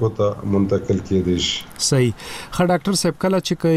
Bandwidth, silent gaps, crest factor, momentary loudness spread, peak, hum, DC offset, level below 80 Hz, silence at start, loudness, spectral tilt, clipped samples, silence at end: 15 kHz; none; 12 dB; 4 LU; -6 dBFS; none; under 0.1%; -44 dBFS; 0 s; -20 LUFS; -5 dB/octave; under 0.1%; 0 s